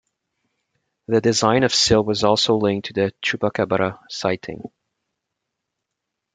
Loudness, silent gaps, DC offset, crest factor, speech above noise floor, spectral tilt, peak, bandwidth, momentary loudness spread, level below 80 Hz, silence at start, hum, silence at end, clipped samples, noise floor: -19 LUFS; none; under 0.1%; 20 dB; 62 dB; -4 dB/octave; -2 dBFS; 9.6 kHz; 9 LU; -50 dBFS; 1.1 s; none; 1.7 s; under 0.1%; -81 dBFS